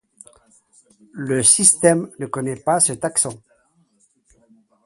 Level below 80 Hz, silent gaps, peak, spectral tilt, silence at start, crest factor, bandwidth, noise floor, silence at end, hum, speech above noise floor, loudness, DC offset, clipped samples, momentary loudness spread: -60 dBFS; none; 0 dBFS; -3 dB/octave; 1.15 s; 22 dB; 12 kHz; -62 dBFS; 1.5 s; none; 43 dB; -16 LUFS; under 0.1%; under 0.1%; 15 LU